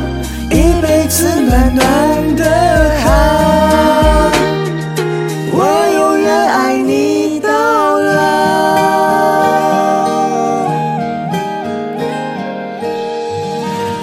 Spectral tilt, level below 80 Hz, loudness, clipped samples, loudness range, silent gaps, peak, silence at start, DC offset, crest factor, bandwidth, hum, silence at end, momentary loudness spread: -5 dB/octave; -22 dBFS; -12 LUFS; under 0.1%; 6 LU; none; 0 dBFS; 0 s; under 0.1%; 12 dB; 17 kHz; none; 0 s; 9 LU